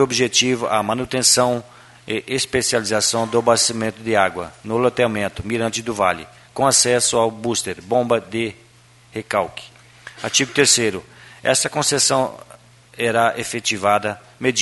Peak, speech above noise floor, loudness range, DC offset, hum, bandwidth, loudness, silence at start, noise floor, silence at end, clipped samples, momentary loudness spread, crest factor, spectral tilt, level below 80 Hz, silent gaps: 0 dBFS; 31 dB; 3 LU; under 0.1%; none; 12 kHz; -18 LUFS; 0 s; -50 dBFS; 0 s; under 0.1%; 12 LU; 20 dB; -2.5 dB/octave; -54 dBFS; none